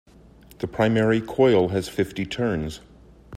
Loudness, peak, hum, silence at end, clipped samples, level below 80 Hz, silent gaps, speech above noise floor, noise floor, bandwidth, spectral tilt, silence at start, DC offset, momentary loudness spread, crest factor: -22 LUFS; -6 dBFS; none; 0 s; under 0.1%; -48 dBFS; none; 28 dB; -50 dBFS; 15 kHz; -6.5 dB/octave; 0.6 s; under 0.1%; 15 LU; 18 dB